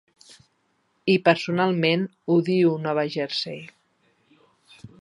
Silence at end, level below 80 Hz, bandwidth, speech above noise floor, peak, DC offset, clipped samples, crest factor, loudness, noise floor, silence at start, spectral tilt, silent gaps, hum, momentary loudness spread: 0.15 s; -72 dBFS; 11 kHz; 47 dB; -2 dBFS; under 0.1%; under 0.1%; 22 dB; -23 LUFS; -69 dBFS; 1.05 s; -6.5 dB/octave; none; none; 9 LU